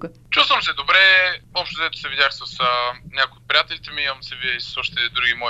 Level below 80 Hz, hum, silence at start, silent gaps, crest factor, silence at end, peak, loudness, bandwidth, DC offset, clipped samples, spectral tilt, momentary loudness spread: -50 dBFS; none; 0 s; none; 20 dB; 0 s; 0 dBFS; -18 LUFS; 12.5 kHz; under 0.1%; under 0.1%; -2 dB/octave; 11 LU